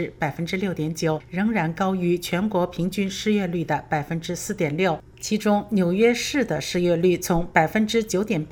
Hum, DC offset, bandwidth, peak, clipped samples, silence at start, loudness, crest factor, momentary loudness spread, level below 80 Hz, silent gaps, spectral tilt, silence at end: none; under 0.1%; over 20 kHz; -2 dBFS; under 0.1%; 0 s; -23 LUFS; 20 dB; 6 LU; -46 dBFS; none; -5.5 dB/octave; 0 s